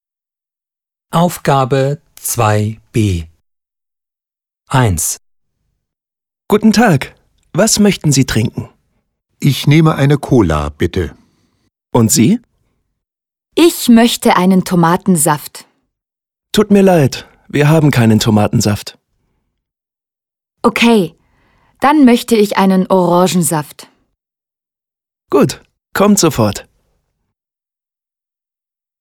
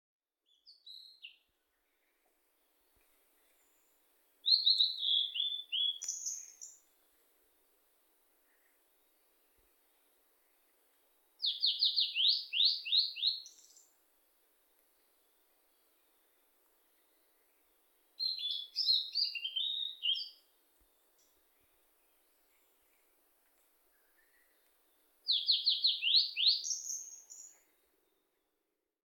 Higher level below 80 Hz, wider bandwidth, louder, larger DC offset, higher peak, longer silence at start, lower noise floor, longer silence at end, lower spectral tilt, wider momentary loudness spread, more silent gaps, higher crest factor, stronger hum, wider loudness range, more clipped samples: first, -38 dBFS vs under -90 dBFS; about the same, 18.5 kHz vs 18 kHz; first, -12 LUFS vs -31 LUFS; neither; first, 0 dBFS vs -14 dBFS; first, 1.1 s vs 0.65 s; about the same, -89 dBFS vs -86 dBFS; first, 2.4 s vs 1.6 s; first, -5.5 dB/octave vs 6 dB/octave; second, 11 LU vs 24 LU; neither; second, 14 dB vs 24 dB; neither; second, 5 LU vs 11 LU; neither